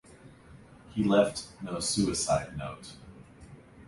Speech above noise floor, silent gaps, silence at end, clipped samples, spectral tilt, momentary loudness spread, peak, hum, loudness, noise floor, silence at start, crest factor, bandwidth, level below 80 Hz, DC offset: 24 dB; none; 0.05 s; under 0.1%; -4.5 dB/octave; 19 LU; -10 dBFS; none; -29 LUFS; -53 dBFS; 0.25 s; 22 dB; 11.5 kHz; -54 dBFS; under 0.1%